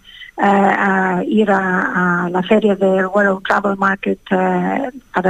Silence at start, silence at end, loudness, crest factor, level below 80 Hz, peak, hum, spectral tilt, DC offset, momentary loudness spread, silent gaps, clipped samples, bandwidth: 0.15 s; 0 s; -15 LUFS; 14 dB; -52 dBFS; -2 dBFS; none; -7 dB/octave; under 0.1%; 6 LU; none; under 0.1%; 9.2 kHz